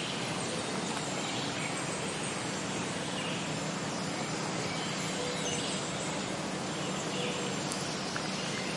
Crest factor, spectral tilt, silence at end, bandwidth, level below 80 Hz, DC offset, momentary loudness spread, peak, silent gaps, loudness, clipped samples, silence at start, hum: 22 dB; -3.5 dB/octave; 0 s; 11.5 kHz; -66 dBFS; under 0.1%; 2 LU; -14 dBFS; none; -34 LUFS; under 0.1%; 0 s; none